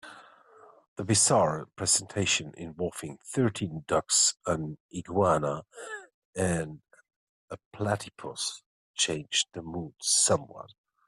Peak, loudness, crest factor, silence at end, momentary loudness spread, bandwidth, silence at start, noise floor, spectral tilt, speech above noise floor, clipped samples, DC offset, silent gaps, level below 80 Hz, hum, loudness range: -10 dBFS; -27 LUFS; 20 dB; 0.4 s; 19 LU; 14 kHz; 0.05 s; -56 dBFS; -3 dB/octave; 27 dB; under 0.1%; under 0.1%; 0.88-0.96 s, 4.80-4.89 s, 6.14-6.33 s, 7.16-7.48 s, 7.65-7.71 s, 8.66-8.94 s; -62 dBFS; none; 6 LU